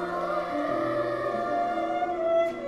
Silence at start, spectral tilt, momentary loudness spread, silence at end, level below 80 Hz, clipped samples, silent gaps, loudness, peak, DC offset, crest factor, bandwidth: 0 s; -6.5 dB/octave; 4 LU; 0 s; -60 dBFS; under 0.1%; none; -28 LUFS; -16 dBFS; under 0.1%; 12 dB; 12 kHz